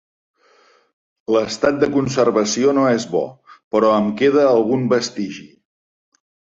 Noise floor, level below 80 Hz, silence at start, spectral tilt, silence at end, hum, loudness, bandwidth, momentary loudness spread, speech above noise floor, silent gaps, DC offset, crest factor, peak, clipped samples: -55 dBFS; -58 dBFS; 1.3 s; -5 dB/octave; 1.05 s; none; -17 LUFS; 7.8 kHz; 12 LU; 38 dB; 3.63-3.71 s; under 0.1%; 16 dB; -2 dBFS; under 0.1%